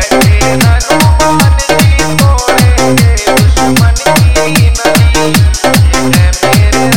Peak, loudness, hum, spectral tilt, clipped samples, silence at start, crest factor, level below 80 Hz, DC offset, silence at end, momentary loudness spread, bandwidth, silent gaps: 0 dBFS; -7 LUFS; none; -4.5 dB/octave; 0.9%; 0 s; 6 dB; -12 dBFS; 6%; 0 s; 1 LU; 18 kHz; none